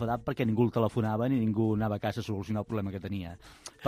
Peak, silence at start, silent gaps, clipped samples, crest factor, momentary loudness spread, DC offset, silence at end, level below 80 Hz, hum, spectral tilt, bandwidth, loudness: -14 dBFS; 0 s; none; under 0.1%; 16 dB; 11 LU; under 0.1%; 0 s; -56 dBFS; none; -8 dB/octave; 15.5 kHz; -31 LUFS